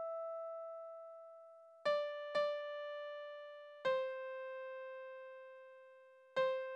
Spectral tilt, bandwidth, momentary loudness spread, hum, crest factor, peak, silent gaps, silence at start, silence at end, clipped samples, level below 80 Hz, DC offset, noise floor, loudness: -3 dB/octave; 9.2 kHz; 19 LU; none; 18 dB; -26 dBFS; none; 0 s; 0 s; under 0.1%; -90 dBFS; under 0.1%; -63 dBFS; -43 LUFS